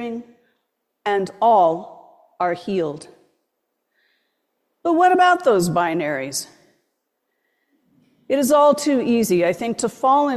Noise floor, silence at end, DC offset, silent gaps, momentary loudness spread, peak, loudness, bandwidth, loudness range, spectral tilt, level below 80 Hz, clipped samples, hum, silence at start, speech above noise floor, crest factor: -75 dBFS; 0 s; under 0.1%; none; 13 LU; -4 dBFS; -19 LUFS; 14.5 kHz; 4 LU; -4.5 dB/octave; -62 dBFS; under 0.1%; none; 0 s; 57 dB; 16 dB